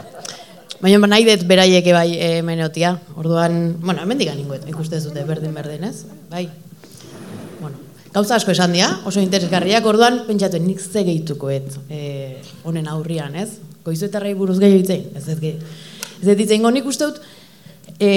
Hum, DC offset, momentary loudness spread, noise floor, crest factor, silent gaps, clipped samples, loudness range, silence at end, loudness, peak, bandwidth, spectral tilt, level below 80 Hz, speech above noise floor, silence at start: none; 0.2%; 20 LU; -44 dBFS; 18 dB; none; under 0.1%; 10 LU; 0 s; -17 LUFS; 0 dBFS; 16.5 kHz; -5 dB/octave; -64 dBFS; 27 dB; 0 s